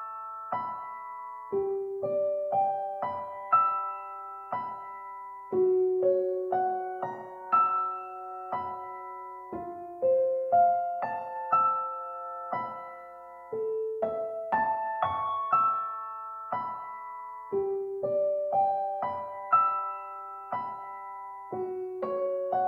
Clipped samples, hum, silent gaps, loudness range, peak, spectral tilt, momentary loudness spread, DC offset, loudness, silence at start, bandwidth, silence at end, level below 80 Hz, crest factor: under 0.1%; none; none; 4 LU; -12 dBFS; -8 dB/octave; 15 LU; under 0.1%; -30 LUFS; 0 s; 4.3 kHz; 0 s; -74 dBFS; 18 dB